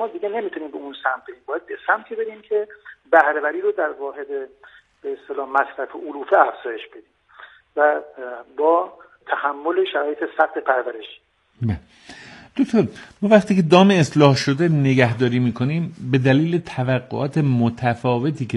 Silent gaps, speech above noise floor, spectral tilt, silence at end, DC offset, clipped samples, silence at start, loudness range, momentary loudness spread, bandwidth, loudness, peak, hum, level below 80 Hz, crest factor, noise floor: none; 26 dB; -7 dB/octave; 0 s; under 0.1%; under 0.1%; 0 s; 7 LU; 16 LU; 11.5 kHz; -20 LUFS; 0 dBFS; none; -58 dBFS; 20 dB; -46 dBFS